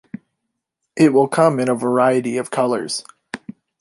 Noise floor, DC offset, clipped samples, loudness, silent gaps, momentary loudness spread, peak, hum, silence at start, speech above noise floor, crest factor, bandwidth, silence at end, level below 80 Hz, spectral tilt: -77 dBFS; under 0.1%; under 0.1%; -17 LUFS; none; 19 LU; -2 dBFS; none; 0.95 s; 61 dB; 18 dB; 11.5 kHz; 0.45 s; -66 dBFS; -5.5 dB/octave